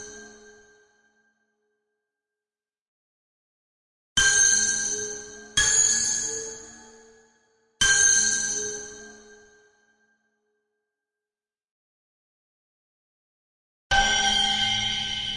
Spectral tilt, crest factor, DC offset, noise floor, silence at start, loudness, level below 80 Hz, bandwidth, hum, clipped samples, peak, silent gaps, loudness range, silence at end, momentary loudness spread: 1 dB/octave; 20 dB; under 0.1%; under -90 dBFS; 0 s; -21 LUFS; -48 dBFS; 11.5 kHz; none; under 0.1%; -8 dBFS; 2.81-4.16 s, 11.71-13.90 s; 8 LU; 0 s; 17 LU